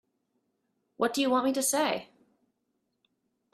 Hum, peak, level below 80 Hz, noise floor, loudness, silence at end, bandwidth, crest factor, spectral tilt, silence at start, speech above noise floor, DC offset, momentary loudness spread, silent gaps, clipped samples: none; -14 dBFS; -78 dBFS; -79 dBFS; -28 LUFS; 1.5 s; 15.5 kHz; 20 dB; -2 dB/octave; 1 s; 52 dB; under 0.1%; 6 LU; none; under 0.1%